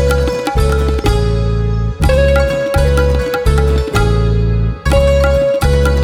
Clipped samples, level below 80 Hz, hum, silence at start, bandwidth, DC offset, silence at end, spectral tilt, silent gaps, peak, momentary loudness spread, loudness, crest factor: under 0.1%; -16 dBFS; none; 0 s; 15.5 kHz; under 0.1%; 0 s; -6.5 dB/octave; none; 0 dBFS; 4 LU; -13 LUFS; 12 dB